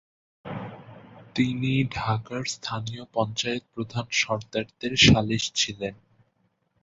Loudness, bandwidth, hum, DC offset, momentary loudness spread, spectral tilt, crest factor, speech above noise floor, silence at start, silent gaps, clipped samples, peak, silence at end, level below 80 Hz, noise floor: -25 LUFS; 8 kHz; none; under 0.1%; 19 LU; -4 dB/octave; 24 dB; 45 dB; 0.45 s; none; under 0.1%; -4 dBFS; 0.9 s; -48 dBFS; -71 dBFS